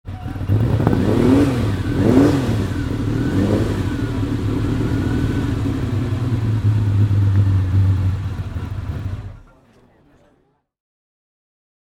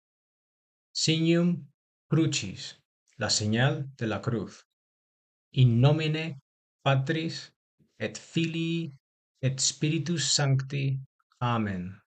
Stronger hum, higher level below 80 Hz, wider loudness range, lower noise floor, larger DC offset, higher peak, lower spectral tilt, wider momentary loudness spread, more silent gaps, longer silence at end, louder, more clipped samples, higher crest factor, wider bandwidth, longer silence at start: neither; first, -32 dBFS vs -62 dBFS; first, 11 LU vs 3 LU; second, -61 dBFS vs under -90 dBFS; neither; first, 0 dBFS vs -10 dBFS; first, -8 dB/octave vs -4.5 dB/octave; about the same, 12 LU vs 13 LU; second, none vs 1.74-2.09 s, 2.85-3.06 s, 4.65-5.52 s, 6.42-6.79 s, 7.56-7.78 s, 9.00-9.35 s, 11.06-11.30 s; first, 2.55 s vs 0.15 s; first, -19 LUFS vs -28 LUFS; neither; about the same, 18 dB vs 18 dB; first, 12 kHz vs 9.2 kHz; second, 0.05 s vs 0.95 s